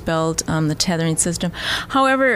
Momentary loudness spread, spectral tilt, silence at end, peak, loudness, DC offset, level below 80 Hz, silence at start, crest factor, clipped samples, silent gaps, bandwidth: 5 LU; -4 dB/octave; 0 s; -4 dBFS; -19 LUFS; under 0.1%; -42 dBFS; 0 s; 16 dB; under 0.1%; none; 15.5 kHz